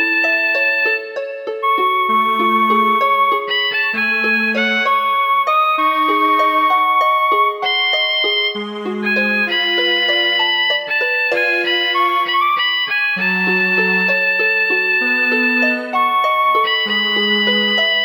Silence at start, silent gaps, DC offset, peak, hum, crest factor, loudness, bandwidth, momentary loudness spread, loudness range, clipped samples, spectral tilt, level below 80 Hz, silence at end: 0 s; none; under 0.1%; -4 dBFS; none; 12 dB; -14 LUFS; 20 kHz; 3 LU; 1 LU; under 0.1%; -4 dB/octave; -78 dBFS; 0 s